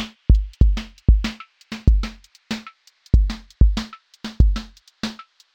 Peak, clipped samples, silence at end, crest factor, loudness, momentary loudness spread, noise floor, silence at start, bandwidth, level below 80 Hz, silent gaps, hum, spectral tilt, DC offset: -2 dBFS; under 0.1%; 0.4 s; 18 dB; -22 LUFS; 16 LU; -47 dBFS; 0 s; 7.8 kHz; -20 dBFS; none; none; -6.5 dB/octave; under 0.1%